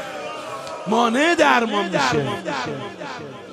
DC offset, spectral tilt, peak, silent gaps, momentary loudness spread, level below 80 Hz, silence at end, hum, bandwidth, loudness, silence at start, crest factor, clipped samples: under 0.1%; -4 dB/octave; -2 dBFS; none; 15 LU; -62 dBFS; 0 s; none; 13 kHz; -20 LUFS; 0 s; 18 dB; under 0.1%